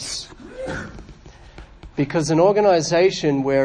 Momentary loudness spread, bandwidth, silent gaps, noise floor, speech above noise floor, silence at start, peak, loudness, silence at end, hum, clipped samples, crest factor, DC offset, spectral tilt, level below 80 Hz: 17 LU; 10.5 kHz; none; -43 dBFS; 26 dB; 0 s; -4 dBFS; -19 LUFS; 0 s; none; under 0.1%; 16 dB; under 0.1%; -5 dB/octave; -46 dBFS